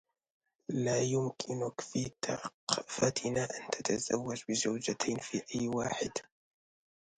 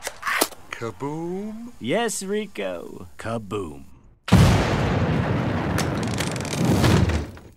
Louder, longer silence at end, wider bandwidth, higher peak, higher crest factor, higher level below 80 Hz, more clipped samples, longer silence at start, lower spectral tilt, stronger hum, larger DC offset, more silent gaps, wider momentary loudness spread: second, -35 LUFS vs -23 LUFS; first, 0.95 s vs 0 s; second, 10.5 kHz vs 16 kHz; second, -10 dBFS vs -2 dBFS; about the same, 26 dB vs 22 dB; second, -68 dBFS vs -36 dBFS; neither; first, 0.7 s vs 0 s; second, -4 dB/octave vs -5.5 dB/octave; neither; neither; first, 2.54-2.67 s vs none; second, 6 LU vs 15 LU